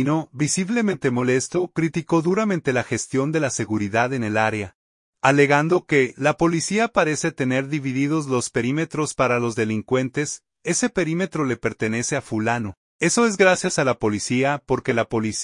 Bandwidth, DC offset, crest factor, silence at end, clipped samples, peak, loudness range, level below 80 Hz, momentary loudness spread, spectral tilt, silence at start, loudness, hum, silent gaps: 11 kHz; under 0.1%; 20 dB; 0 s; under 0.1%; -2 dBFS; 3 LU; -56 dBFS; 6 LU; -5 dB/octave; 0 s; -21 LUFS; none; 4.75-5.13 s, 12.77-12.99 s